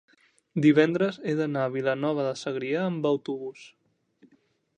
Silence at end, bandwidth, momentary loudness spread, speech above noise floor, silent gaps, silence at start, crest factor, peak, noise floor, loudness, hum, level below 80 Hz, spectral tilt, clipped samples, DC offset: 1.1 s; 9.4 kHz; 13 LU; 40 dB; none; 0.55 s; 20 dB; -6 dBFS; -66 dBFS; -26 LUFS; none; -74 dBFS; -7 dB/octave; under 0.1%; under 0.1%